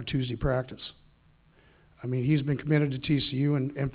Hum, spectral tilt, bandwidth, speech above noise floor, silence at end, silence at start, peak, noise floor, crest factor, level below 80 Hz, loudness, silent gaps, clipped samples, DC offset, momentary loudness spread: none; -11 dB/octave; 4 kHz; 34 dB; 0 s; 0 s; -12 dBFS; -61 dBFS; 18 dB; -48 dBFS; -28 LUFS; none; under 0.1%; under 0.1%; 13 LU